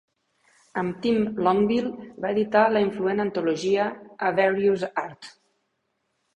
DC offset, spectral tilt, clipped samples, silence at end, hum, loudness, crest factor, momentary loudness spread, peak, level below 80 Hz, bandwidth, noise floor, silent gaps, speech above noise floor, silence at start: under 0.1%; -6.5 dB/octave; under 0.1%; 1.05 s; none; -24 LUFS; 20 dB; 11 LU; -6 dBFS; -62 dBFS; 9.4 kHz; -75 dBFS; none; 52 dB; 0.75 s